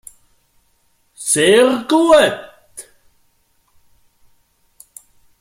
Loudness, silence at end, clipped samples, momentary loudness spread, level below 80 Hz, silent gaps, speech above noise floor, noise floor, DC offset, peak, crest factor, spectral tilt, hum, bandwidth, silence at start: -13 LUFS; 2.6 s; under 0.1%; 26 LU; -54 dBFS; none; 48 dB; -60 dBFS; under 0.1%; 0 dBFS; 18 dB; -3 dB/octave; none; 16.5 kHz; 1.2 s